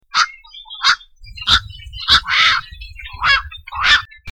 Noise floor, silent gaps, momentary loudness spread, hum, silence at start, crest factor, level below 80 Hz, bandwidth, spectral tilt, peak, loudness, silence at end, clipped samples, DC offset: -37 dBFS; none; 21 LU; none; 0.15 s; 18 dB; -36 dBFS; 18 kHz; 0 dB/octave; 0 dBFS; -15 LUFS; 0 s; under 0.1%; under 0.1%